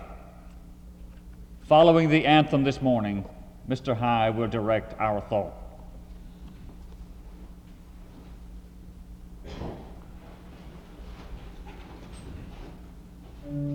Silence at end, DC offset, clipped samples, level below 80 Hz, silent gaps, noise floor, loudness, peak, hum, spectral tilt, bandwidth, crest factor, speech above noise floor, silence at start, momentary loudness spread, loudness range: 0 s; under 0.1%; under 0.1%; -46 dBFS; none; -46 dBFS; -24 LUFS; -6 dBFS; none; -7.5 dB/octave; 14.5 kHz; 22 dB; 23 dB; 0 s; 28 LU; 24 LU